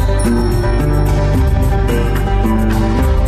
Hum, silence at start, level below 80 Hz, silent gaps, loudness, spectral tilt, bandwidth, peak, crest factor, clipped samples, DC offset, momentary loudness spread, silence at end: none; 0 s; -14 dBFS; none; -15 LUFS; -7 dB/octave; 14.5 kHz; -4 dBFS; 8 dB; under 0.1%; under 0.1%; 1 LU; 0 s